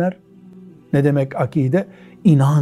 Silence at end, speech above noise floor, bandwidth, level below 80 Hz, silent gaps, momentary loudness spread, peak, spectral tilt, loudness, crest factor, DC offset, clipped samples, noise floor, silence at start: 0 s; 25 dB; 12 kHz; -58 dBFS; none; 8 LU; -2 dBFS; -9 dB/octave; -18 LUFS; 16 dB; under 0.1%; under 0.1%; -42 dBFS; 0 s